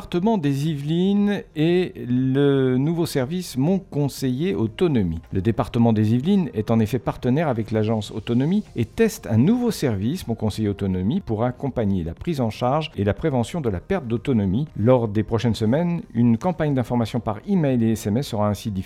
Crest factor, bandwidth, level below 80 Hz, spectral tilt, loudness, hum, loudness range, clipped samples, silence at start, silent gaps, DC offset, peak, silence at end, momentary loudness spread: 16 dB; 15.5 kHz; -46 dBFS; -7.5 dB/octave; -22 LUFS; none; 2 LU; under 0.1%; 0 s; none; under 0.1%; -4 dBFS; 0 s; 6 LU